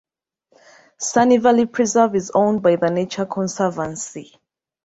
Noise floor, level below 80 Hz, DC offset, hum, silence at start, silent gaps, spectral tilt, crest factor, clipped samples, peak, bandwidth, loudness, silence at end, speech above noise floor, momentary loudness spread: -66 dBFS; -60 dBFS; under 0.1%; none; 1 s; none; -5 dB/octave; 18 dB; under 0.1%; -2 dBFS; 8 kHz; -18 LUFS; 0.65 s; 48 dB; 12 LU